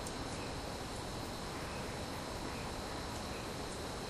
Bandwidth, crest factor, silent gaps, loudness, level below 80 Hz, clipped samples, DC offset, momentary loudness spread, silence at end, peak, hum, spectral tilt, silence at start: 15.5 kHz; 14 dB; none; -42 LUFS; -52 dBFS; under 0.1%; under 0.1%; 1 LU; 0 s; -28 dBFS; none; -4 dB/octave; 0 s